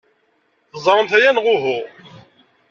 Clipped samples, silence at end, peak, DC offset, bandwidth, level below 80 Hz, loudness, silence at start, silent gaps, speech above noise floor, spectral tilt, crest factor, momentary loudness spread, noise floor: under 0.1%; 0.85 s; -2 dBFS; under 0.1%; 7.4 kHz; -66 dBFS; -16 LUFS; 0.75 s; none; 48 dB; -4 dB/octave; 18 dB; 18 LU; -63 dBFS